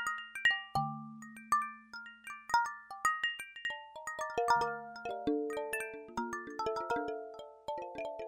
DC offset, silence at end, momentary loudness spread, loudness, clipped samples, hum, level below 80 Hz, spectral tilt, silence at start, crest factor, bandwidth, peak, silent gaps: under 0.1%; 0 s; 16 LU; -36 LUFS; under 0.1%; none; -68 dBFS; -3.5 dB/octave; 0 s; 20 dB; 16 kHz; -16 dBFS; none